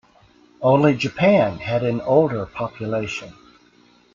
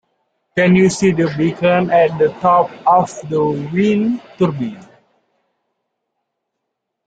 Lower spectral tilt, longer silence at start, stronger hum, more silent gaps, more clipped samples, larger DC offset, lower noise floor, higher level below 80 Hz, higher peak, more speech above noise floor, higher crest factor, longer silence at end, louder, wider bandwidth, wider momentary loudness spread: about the same, -7 dB/octave vs -6.5 dB/octave; about the same, 0.6 s vs 0.55 s; neither; neither; neither; neither; second, -55 dBFS vs -76 dBFS; about the same, -54 dBFS vs -54 dBFS; about the same, -4 dBFS vs -2 dBFS; second, 36 dB vs 62 dB; about the same, 18 dB vs 16 dB; second, 0.85 s vs 2.25 s; second, -20 LUFS vs -15 LUFS; second, 7.6 kHz vs 9.2 kHz; first, 12 LU vs 8 LU